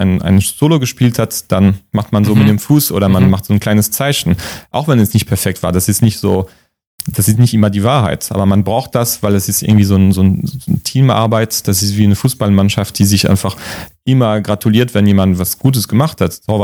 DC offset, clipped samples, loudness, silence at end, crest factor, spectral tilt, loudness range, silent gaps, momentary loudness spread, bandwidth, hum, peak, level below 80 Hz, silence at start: under 0.1%; under 0.1%; -12 LUFS; 0 s; 12 dB; -5.5 dB/octave; 2 LU; 6.87-6.98 s; 7 LU; over 20 kHz; none; 0 dBFS; -40 dBFS; 0 s